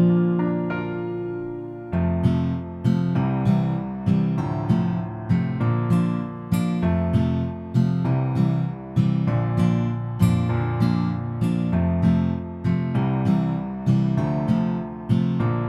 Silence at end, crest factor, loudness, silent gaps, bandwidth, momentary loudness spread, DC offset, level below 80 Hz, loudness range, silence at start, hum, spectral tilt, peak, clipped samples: 0 s; 16 dB; -23 LUFS; none; 11.5 kHz; 6 LU; under 0.1%; -44 dBFS; 1 LU; 0 s; none; -9 dB/octave; -6 dBFS; under 0.1%